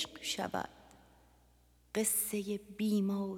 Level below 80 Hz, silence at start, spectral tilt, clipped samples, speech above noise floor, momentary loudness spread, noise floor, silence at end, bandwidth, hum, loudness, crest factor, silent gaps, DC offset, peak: -68 dBFS; 0 s; -3.5 dB/octave; under 0.1%; 32 dB; 10 LU; -67 dBFS; 0 s; 18 kHz; 60 Hz at -70 dBFS; -35 LUFS; 18 dB; none; under 0.1%; -20 dBFS